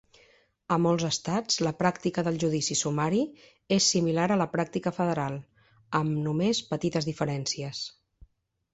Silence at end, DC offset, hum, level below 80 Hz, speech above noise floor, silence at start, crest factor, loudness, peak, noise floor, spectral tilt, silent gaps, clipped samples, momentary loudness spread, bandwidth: 0.85 s; under 0.1%; none; -62 dBFS; 35 dB; 0.7 s; 20 dB; -28 LUFS; -8 dBFS; -62 dBFS; -4.5 dB/octave; none; under 0.1%; 7 LU; 8.2 kHz